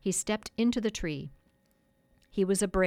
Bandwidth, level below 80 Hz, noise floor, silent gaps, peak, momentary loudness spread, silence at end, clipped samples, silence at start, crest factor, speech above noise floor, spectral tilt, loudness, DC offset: 16 kHz; -50 dBFS; -69 dBFS; none; -16 dBFS; 11 LU; 0 s; under 0.1%; 0.05 s; 16 dB; 40 dB; -4.5 dB/octave; -31 LUFS; under 0.1%